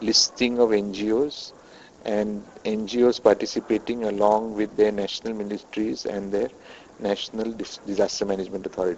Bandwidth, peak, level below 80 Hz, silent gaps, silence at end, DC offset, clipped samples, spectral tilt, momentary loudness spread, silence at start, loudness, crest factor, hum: 8.2 kHz; -4 dBFS; -56 dBFS; none; 0 s; under 0.1%; under 0.1%; -3.5 dB/octave; 11 LU; 0 s; -24 LUFS; 20 dB; none